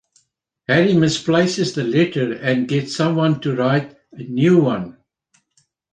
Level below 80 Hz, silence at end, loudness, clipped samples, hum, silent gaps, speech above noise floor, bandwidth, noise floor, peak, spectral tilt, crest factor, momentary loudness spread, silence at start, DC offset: -58 dBFS; 1 s; -18 LUFS; under 0.1%; none; none; 50 dB; 9.6 kHz; -68 dBFS; -2 dBFS; -6 dB/octave; 16 dB; 12 LU; 0.7 s; under 0.1%